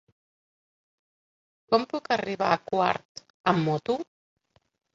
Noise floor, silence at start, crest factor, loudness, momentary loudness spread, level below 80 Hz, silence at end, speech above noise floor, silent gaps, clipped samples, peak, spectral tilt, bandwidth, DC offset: under -90 dBFS; 1.7 s; 24 dB; -27 LUFS; 8 LU; -68 dBFS; 0.9 s; over 64 dB; 3.05-3.15 s, 3.30-3.44 s; under 0.1%; -6 dBFS; -6 dB/octave; 7.8 kHz; under 0.1%